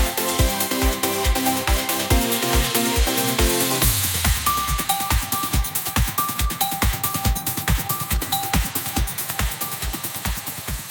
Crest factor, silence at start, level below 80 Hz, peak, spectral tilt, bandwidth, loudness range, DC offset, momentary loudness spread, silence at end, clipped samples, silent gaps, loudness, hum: 20 dB; 0 s; -26 dBFS; 0 dBFS; -3 dB/octave; 19 kHz; 4 LU; under 0.1%; 6 LU; 0 s; under 0.1%; none; -21 LUFS; none